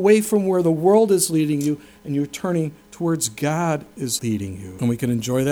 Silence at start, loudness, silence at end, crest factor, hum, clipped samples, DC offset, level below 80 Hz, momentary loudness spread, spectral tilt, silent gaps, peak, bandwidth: 0 s; -21 LUFS; 0 s; 16 dB; none; under 0.1%; under 0.1%; -56 dBFS; 11 LU; -5.5 dB/octave; none; -4 dBFS; over 20 kHz